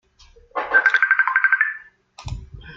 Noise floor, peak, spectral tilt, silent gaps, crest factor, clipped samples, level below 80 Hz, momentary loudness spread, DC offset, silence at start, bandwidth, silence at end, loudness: -51 dBFS; -2 dBFS; -3.5 dB/octave; none; 20 dB; under 0.1%; -44 dBFS; 20 LU; under 0.1%; 0.55 s; 7.8 kHz; 0 s; -17 LUFS